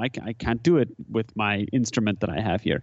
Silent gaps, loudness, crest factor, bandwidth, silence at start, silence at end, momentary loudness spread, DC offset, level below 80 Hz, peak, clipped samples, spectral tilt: none; -25 LUFS; 16 dB; 8.2 kHz; 0 s; 0 s; 8 LU; under 0.1%; -48 dBFS; -8 dBFS; under 0.1%; -6 dB/octave